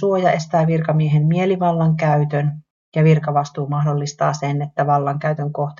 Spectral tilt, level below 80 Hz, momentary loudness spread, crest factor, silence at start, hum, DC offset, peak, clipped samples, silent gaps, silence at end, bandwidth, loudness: -7.5 dB/octave; -56 dBFS; 6 LU; 14 dB; 0 s; none; under 0.1%; -4 dBFS; under 0.1%; 2.70-2.92 s; 0.05 s; 7.4 kHz; -18 LUFS